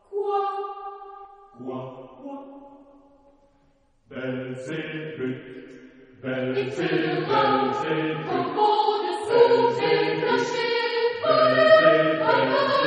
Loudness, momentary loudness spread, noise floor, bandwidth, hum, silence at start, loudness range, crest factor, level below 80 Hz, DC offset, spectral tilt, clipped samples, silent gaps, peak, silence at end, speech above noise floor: -22 LUFS; 21 LU; -62 dBFS; 10 kHz; none; 0.1 s; 18 LU; 20 dB; -66 dBFS; under 0.1%; -5.5 dB/octave; under 0.1%; none; -4 dBFS; 0 s; 40 dB